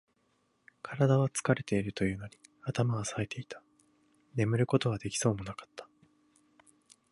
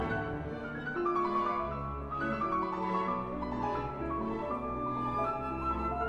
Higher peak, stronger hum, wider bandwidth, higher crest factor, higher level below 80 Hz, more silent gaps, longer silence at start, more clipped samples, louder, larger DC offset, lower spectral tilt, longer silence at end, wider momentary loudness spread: first, -12 dBFS vs -20 dBFS; neither; first, 11.5 kHz vs 9 kHz; first, 22 dB vs 14 dB; second, -60 dBFS vs -48 dBFS; neither; first, 0.85 s vs 0 s; neither; about the same, -32 LUFS vs -34 LUFS; neither; second, -5.5 dB/octave vs -8 dB/octave; first, 1.3 s vs 0 s; first, 20 LU vs 6 LU